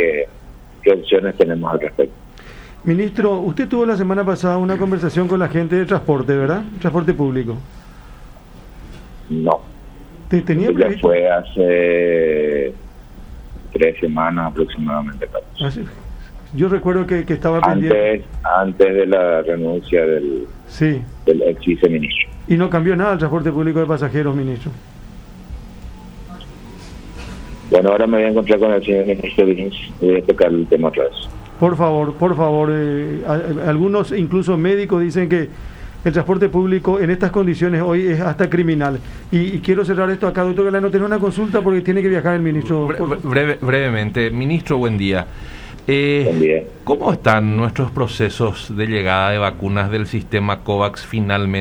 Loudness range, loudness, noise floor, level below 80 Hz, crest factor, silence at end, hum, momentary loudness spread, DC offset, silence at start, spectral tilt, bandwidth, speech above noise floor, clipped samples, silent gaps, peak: 5 LU; -17 LUFS; -38 dBFS; -38 dBFS; 16 dB; 0 s; none; 12 LU; under 0.1%; 0 s; -8 dB/octave; 10.5 kHz; 22 dB; under 0.1%; none; 0 dBFS